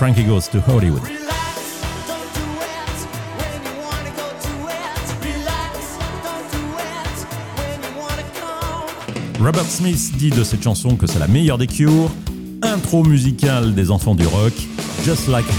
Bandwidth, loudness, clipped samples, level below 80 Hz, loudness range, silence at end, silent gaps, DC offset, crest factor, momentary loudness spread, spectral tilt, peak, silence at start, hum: 18.5 kHz; -19 LUFS; under 0.1%; -32 dBFS; 10 LU; 0 s; none; under 0.1%; 16 dB; 12 LU; -5.5 dB/octave; -2 dBFS; 0 s; none